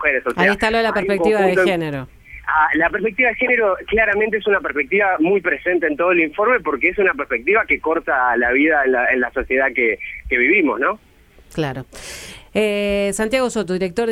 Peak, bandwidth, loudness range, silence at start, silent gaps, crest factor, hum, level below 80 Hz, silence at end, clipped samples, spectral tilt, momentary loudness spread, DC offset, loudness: -2 dBFS; 15 kHz; 3 LU; 0 s; none; 16 dB; none; -44 dBFS; 0 s; under 0.1%; -5 dB/octave; 10 LU; under 0.1%; -17 LUFS